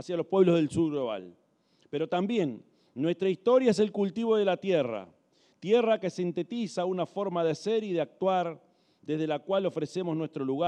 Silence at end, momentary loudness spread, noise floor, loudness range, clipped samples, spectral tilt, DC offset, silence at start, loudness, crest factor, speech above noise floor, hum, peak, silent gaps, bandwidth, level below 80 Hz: 0 s; 11 LU; -67 dBFS; 3 LU; under 0.1%; -6.5 dB/octave; under 0.1%; 0 s; -29 LUFS; 18 dB; 39 dB; none; -10 dBFS; none; 10 kHz; -74 dBFS